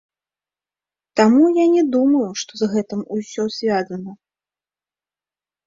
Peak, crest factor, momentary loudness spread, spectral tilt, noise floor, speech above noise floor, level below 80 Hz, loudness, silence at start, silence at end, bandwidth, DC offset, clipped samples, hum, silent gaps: -2 dBFS; 18 dB; 13 LU; -5.5 dB/octave; under -90 dBFS; over 73 dB; -66 dBFS; -18 LUFS; 1.15 s; 1.55 s; 7.6 kHz; under 0.1%; under 0.1%; 50 Hz at -50 dBFS; none